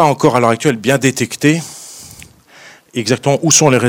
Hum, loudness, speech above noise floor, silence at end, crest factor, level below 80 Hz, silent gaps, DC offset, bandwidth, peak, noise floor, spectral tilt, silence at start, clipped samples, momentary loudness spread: none; -13 LUFS; 29 dB; 0 s; 14 dB; -54 dBFS; none; under 0.1%; over 20 kHz; 0 dBFS; -41 dBFS; -4 dB/octave; 0 s; 0.2%; 21 LU